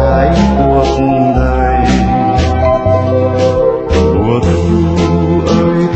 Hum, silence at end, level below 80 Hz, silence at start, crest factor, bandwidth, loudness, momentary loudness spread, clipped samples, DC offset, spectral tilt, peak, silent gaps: none; 0 s; -20 dBFS; 0 s; 10 dB; 8.4 kHz; -11 LUFS; 2 LU; under 0.1%; under 0.1%; -7.5 dB/octave; 0 dBFS; none